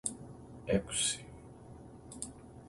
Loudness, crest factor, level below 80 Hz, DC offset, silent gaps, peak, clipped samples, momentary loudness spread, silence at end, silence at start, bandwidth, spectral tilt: -35 LUFS; 26 dB; -58 dBFS; under 0.1%; none; -14 dBFS; under 0.1%; 21 LU; 0 s; 0.05 s; 11.5 kHz; -3 dB/octave